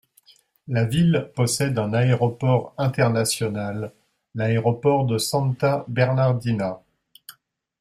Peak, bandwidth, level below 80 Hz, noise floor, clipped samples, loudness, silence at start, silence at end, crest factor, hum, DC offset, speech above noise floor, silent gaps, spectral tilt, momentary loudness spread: -4 dBFS; 15 kHz; -56 dBFS; -57 dBFS; under 0.1%; -22 LUFS; 0.7 s; 0.5 s; 18 dB; none; under 0.1%; 36 dB; none; -6 dB/octave; 8 LU